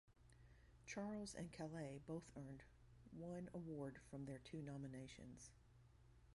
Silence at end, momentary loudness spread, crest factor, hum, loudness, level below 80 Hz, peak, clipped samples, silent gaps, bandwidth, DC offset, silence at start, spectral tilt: 0 s; 12 LU; 16 dB; none; -54 LUFS; -72 dBFS; -38 dBFS; under 0.1%; none; 11.5 kHz; under 0.1%; 0.05 s; -6 dB/octave